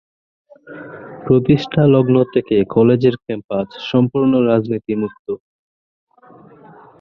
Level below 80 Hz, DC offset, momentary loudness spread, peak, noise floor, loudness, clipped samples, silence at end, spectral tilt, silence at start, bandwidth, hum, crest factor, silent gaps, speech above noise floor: -50 dBFS; under 0.1%; 17 LU; -2 dBFS; -45 dBFS; -16 LUFS; under 0.1%; 1.65 s; -9.5 dB/octave; 0.65 s; 6.4 kHz; none; 16 dB; 3.44-3.49 s, 5.19-5.25 s; 29 dB